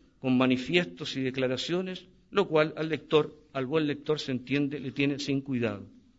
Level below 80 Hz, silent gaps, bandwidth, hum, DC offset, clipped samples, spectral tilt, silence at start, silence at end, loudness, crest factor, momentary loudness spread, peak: -64 dBFS; none; 8 kHz; none; under 0.1%; under 0.1%; -6 dB/octave; 0.25 s; 0.3 s; -29 LUFS; 20 dB; 8 LU; -10 dBFS